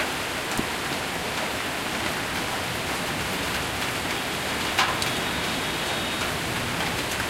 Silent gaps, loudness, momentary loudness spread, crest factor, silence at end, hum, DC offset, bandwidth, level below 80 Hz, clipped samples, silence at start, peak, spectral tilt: none; -26 LUFS; 4 LU; 22 dB; 0 s; none; under 0.1%; 16 kHz; -46 dBFS; under 0.1%; 0 s; -4 dBFS; -2.5 dB/octave